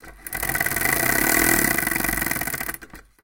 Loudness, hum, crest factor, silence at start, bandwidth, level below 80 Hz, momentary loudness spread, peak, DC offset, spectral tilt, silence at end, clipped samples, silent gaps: -20 LUFS; none; 22 dB; 0.05 s; 17.5 kHz; -40 dBFS; 12 LU; -2 dBFS; under 0.1%; -2.5 dB/octave; 0.25 s; under 0.1%; none